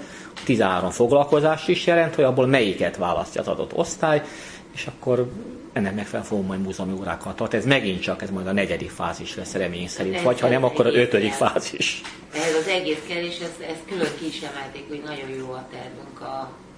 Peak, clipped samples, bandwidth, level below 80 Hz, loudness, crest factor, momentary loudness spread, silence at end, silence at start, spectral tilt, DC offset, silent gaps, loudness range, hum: 0 dBFS; under 0.1%; 10.5 kHz; -54 dBFS; -23 LUFS; 22 dB; 15 LU; 0 s; 0 s; -5 dB/octave; under 0.1%; none; 7 LU; none